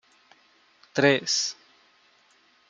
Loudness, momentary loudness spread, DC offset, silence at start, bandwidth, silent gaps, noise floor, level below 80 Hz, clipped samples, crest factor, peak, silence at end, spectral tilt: -24 LUFS; 13 LU; under 0.1%; 0.95 s; 11 kHz; none; -62 dBFS; -76 dBFS; under 0.1%; 24 dB; -4 dBFS; 1.15 s; -3 dB/octave